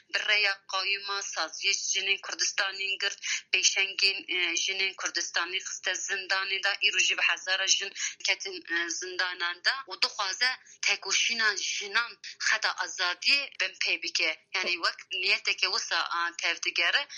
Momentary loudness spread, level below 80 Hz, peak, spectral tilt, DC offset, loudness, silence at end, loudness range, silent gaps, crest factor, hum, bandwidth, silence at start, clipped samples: 7 LU; under -90 dBFS; -8 dBFS; 2.5 dB/octave; under 0.1%; -27 LUFS; 0 s; 1 LU; none; 22 dB; none; 11 kHz; 0.15 s; under 0.1%